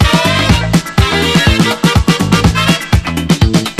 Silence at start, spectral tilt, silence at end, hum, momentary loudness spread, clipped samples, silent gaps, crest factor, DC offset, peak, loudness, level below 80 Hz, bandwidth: 0 s; -5 dB/octave; 0 s; none; 3 LU; 0.5%; none; 10 dB; under 0.1%; 0 dBFS; -11 LUFS; -20 dBFS; 14.5 kHz